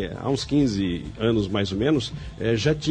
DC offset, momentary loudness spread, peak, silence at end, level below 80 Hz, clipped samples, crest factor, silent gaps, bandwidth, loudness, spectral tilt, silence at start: under 0.1%; 5 LU; -8 dBFS; 0 s; -42 dBFS; under 0.1%; 14 dB; none; 10 kHz; -24 LUFS; -6 dB/octave; 0 s